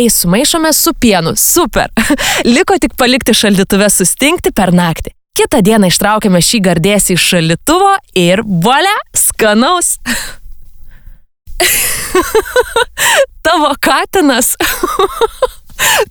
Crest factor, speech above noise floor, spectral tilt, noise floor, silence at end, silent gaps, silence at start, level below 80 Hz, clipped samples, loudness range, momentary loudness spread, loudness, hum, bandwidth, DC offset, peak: 10 dB; 24 dB; -3 dB/octave; -34 dBFS; 0.05 s; none; 0 s; -32 dBFS; under 0.1%; 3 LU; 5 LU; -10 LUFS; none; over 20 kHz; under 0.1%; 0 dBFS